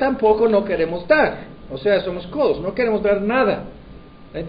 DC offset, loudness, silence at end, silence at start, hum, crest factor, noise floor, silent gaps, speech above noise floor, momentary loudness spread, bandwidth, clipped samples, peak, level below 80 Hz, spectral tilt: under 0.1%; -19 LUFS; 0 s; 0 s; none; 16 dB; -41 dBFS; none; 22 dB; 13 LU; 5.2 kHz; under 0.1%; -2 dBFS; -44 dBFS; -9.5 dB/octave